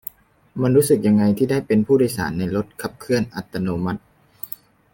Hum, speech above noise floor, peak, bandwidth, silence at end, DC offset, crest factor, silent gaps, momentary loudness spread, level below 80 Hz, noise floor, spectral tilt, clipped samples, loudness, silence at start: none; 21 dB; -4 dBFS; 17 kHz; 0.45 s; under 0.1%; 16 dB; none; 17 LU; -52 dBFS; -40 dBFS; -6.5 dB/octave; under 0.1%; -20 LUFS; 0.55 s